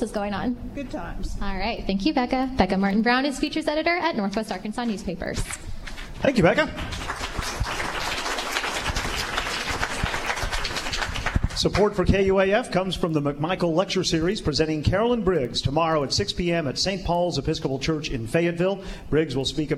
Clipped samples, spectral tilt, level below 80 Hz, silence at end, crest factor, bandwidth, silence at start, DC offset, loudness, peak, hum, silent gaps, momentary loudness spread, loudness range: under 0.1%; -5 dB/octave; -36 dBFS; 0 s; 20 dB; 15 kHz; 0 s; under 0.1%; -24 LUFS; -4 dBFS; none; none; 9 LU; 4 LU